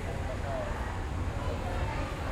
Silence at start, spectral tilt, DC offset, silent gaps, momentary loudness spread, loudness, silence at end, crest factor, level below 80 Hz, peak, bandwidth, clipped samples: 0 s; -6 dB/octave; under 0.1%; none; 2 LU; -35 LUFS; 0 s; 12 dB; -38 dBFS; -20 dBFS; 14.5 kHz; under 0.1%